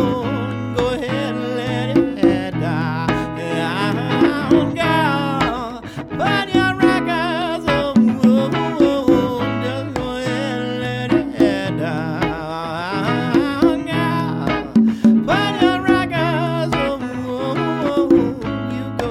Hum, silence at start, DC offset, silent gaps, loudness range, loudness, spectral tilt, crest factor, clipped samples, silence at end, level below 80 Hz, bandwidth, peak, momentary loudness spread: none; 0 s; under 0.1%; none; 3 LU; -18 LUFS; -6.5 dB/octave; 16 dB; under 0.1%; 0 s; -42 dBFS; 13 kHz; -2 dBFS; 8 LU